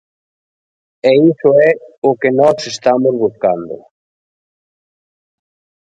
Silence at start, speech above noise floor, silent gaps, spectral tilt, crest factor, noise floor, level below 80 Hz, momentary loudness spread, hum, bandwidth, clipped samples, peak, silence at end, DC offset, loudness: 1.05 s; over 78 dB; 1.98-2.02 s; -6 dB/octave; 16 dB; under -90 dBFS; -60 dBFS; 7 LU; none; 9.2 kHz; under 0.1%; 0 dBFS; 2.2 s; under 0.1%; -13 LUFS